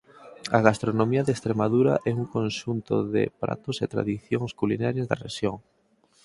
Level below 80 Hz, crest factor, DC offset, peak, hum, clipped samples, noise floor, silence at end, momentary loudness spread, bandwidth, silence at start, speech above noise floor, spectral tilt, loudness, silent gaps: -58 dBFS; 24 dB; under 0.1%; 0 dBFS; none; under 0.1%; -65 dBFS; 0.65 s; 9 LU; 11.5 kHz; 0.2 s; 40 dB; -6.5 dB/octave; -26 LUFS; none